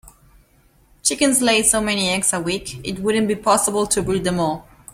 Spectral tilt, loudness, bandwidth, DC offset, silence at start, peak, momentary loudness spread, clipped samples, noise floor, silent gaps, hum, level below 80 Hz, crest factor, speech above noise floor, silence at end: -3 dB/octave; -18 LUFS; 16.5 kHz; under 0.1%; 0.05 s; -2 dBFS; 10 LU; under 0.1%; -56 dBFS; none; none; -46 dBFS; 18 dB; 36 dB; 0.35 s